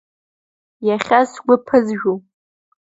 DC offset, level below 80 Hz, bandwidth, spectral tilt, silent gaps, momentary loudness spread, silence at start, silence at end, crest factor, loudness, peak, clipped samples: under 0.1%; -60 dBFS; 7.8 kHz; -6 dB/octave; none; 8 LU; 0.8 s; 0.7 s; 18 dB; -17 LUFS; 0 dBFS; under 0.1%